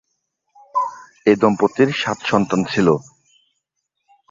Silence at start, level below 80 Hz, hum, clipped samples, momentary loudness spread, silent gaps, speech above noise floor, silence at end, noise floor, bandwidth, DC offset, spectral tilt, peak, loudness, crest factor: 0.75 s; -56 dBFS; none; under 0.1%; 8 LU; none; 59 dB; 1.3 s; -76 dBFS; 7.6 kHz; under 0.1%; -6 dB/octave; -2 dBFS; -18 LUFS; 18 dB